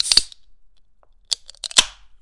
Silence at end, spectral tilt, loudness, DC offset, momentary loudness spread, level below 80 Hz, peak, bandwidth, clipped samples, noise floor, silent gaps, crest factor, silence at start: 0.3 s; 2 dB/octave; -19 LUFS; under 0.1%; 15 LU; -46 dBFS; 0 dBFS; 12 kHz; under 0.1%; -55 dBFS; none; 24 dB; 0 s